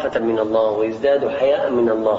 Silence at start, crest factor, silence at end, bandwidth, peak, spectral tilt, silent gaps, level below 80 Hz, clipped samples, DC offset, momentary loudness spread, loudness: 0 s; 12 dB; 0 s; 7.4 kHz; -6 dBFS; -7 dB/octave; none; -54 dBFS; under 0.1%; under 0.1%; 2 LU; -18 LUFS